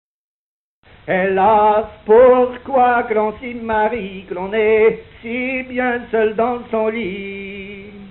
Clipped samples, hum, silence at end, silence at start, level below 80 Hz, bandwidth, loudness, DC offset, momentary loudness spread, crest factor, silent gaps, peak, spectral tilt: under 0.1%; none; 0 s; 1.05 s; -48 dBFS; 4.2 kHz; -16 LUFS; under 0.1%; 16 LU; 16 dB; none; -2 dBFS; -10.5 dB/octave